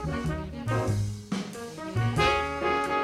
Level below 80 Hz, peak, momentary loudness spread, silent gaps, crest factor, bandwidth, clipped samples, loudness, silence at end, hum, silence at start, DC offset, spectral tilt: -42 dBFS; -10 dBFS; 10 LU; none; 18 dB; 13.5 kHz; under 0.1%; -29 LUFS; 0 s; none; 0 s; under 0.1%; -5.5 dB/octave